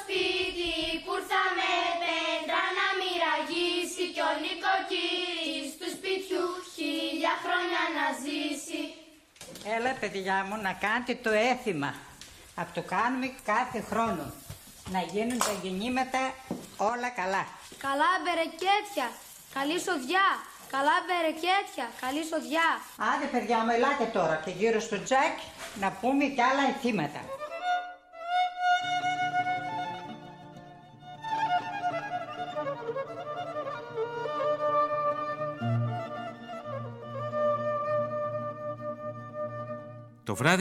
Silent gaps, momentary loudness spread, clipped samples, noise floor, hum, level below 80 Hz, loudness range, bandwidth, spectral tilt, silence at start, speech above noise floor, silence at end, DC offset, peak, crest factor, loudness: none; 13 LU; under 0.1%; -52 dBFS; none; -64 dBFS; 5 LU; 15.5 kHz; -4 dB/octave; 0 s; 23 dB; 0 s; under 0.1%; -8 dBFS; 22 dB; -30 LUFS